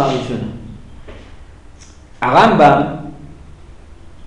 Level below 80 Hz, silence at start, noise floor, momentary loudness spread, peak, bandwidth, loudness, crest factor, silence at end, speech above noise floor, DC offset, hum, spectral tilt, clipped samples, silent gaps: -40 dBFS; 0 s; -39 dBFS; 25 LU; 0 dBFS; 10.5 kHz; -13 LUFS; 16 dB; 0 s; 27 dB; under 0.1%; none; -6.5 dB/octave; under 0.1%; none